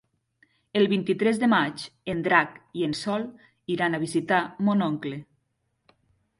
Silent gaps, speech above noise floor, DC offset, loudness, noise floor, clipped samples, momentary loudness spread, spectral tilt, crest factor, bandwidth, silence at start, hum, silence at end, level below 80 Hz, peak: none; 50 dB; under 0.1%; -25 LUFS; -75 dBFS; under 0.1%; 12 LU; -5.5 dB/octave; 22 dB; 11.5 kHz; 0.75 s; none; 1.15 s; -66 dBFS; -4 dBFS